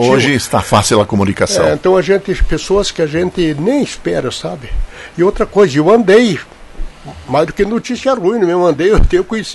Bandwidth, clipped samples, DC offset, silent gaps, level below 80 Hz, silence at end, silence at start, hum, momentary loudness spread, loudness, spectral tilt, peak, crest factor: 12 kHz; under 0.1%; under 0.1%; none; -24 dBFS; 0 s; 0 s; none; 13 LU; -13 LUFS; -5 dB/octave; 0 dBFS; 12 dB